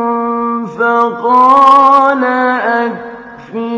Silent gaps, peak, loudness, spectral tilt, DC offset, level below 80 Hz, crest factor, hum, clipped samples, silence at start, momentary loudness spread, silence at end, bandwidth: none; 0 dBFS; -10 LUFS; -5.5 dB/octave; under 0.1%; -54 dBFS; 10 dB; none; 0.9%; 0 s; 16 LU; 0 s; 9.6 kHz